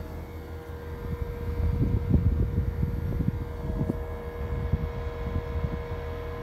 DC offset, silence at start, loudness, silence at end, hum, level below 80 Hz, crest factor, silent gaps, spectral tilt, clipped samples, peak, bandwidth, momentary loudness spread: under 0.1%; 0 s; -31 LUFS; 0 s; none; -34 dBFS; 20 dB; none; -9 dB/octave; under 0.1%; -10 dBFS; 14 kHz; 13 LU